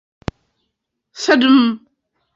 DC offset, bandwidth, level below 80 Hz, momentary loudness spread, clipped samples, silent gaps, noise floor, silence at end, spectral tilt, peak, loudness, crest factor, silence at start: under 0.1%; 7.6 kHz; -46 dBFS; 20 LU; under 0.1%; none; -75 dBFS; 0.6 s; -4.5 dB/octave; -2 dBFS; -14 LUFS; 16 dB; 1.15 s